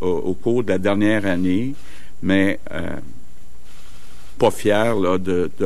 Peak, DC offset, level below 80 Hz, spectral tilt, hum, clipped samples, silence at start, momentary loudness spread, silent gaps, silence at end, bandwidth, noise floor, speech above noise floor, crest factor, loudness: -2 dBFS; 8%; -46 dBFS; -6.5 dB/octave; none; under 0.1%; 0 s; 11 LU; none; 0 s; 13 kHz; -45 dBFS; 25 dB; 18 dB; -20 LUFS